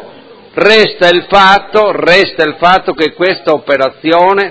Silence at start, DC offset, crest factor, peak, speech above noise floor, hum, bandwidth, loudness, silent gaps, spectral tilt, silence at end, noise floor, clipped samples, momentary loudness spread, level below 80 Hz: 0 s; under 0.1%; 10 dB; 0 dBFS; 26 dB; none; 8 kHz; -8 LUFS; none; -4.5 dB/octave; 0 s; -35 dBFS; 2%; 6 LU; -44 dBFS